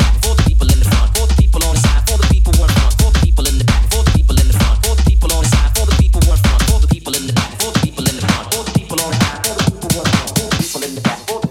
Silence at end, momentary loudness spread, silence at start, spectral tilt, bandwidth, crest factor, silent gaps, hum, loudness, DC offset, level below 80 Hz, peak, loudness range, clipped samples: 0 s; 5 LU; 0 s; -4.5 dB/octave; 16.5 kHz; 12 dB; none; none; -14 LUFS; under 0.1%; -14 dBFS; 0 dBFS; 3 LU; under 0.1%